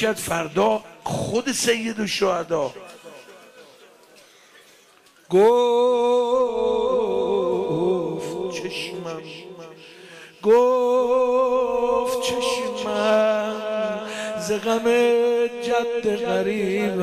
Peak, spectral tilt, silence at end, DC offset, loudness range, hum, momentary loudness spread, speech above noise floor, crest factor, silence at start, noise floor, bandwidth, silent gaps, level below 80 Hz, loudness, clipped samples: -8 dBFS; -4 dB/octave; 0 s; under 0.1%; 6 LU; none; 12 LU; 34 dB; 14 dB; 0 s; -54 dBFS; 15 kHz; none; -58 dBFS; -21 LUFS; under 0.1%